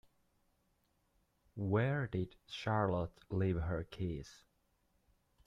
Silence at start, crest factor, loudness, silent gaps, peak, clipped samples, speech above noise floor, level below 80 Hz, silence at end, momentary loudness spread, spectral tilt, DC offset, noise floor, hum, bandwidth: 1.55 s; 18 dB; -38 LUFS; none; -22 dBFS; under 0.1%; 41 dB; -58 dBFS; 1.1 s; 10 LU; -7.5 dB/octave; under 0.1%; -78 dBFS; none; 7.6 kHz